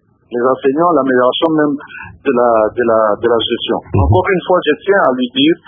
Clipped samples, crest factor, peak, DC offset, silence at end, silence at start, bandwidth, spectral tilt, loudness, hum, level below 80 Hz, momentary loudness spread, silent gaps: under 0.1%; 12 dB; 0 dBFS; under 0.1%; 0.1 s; 0.3 s; 3.8 kHz; -10 dB/octave; -13 LUFS; none; -30 dBFS; 6 LU; none